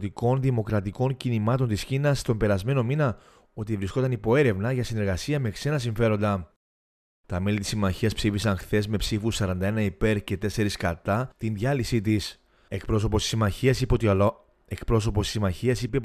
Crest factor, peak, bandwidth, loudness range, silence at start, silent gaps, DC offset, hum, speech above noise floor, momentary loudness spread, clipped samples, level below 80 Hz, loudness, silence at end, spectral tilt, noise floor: 18 dB; -8 dBFS; 14.5 kHz; 2 LU; 0 s; 6.56-7.24 s; under 0.1%; none; over 65 dB; 6 LU; under 0.1%; -40 dBFS; -26 LUFS; 0 s; -6 dB/octave; under -90 dBFS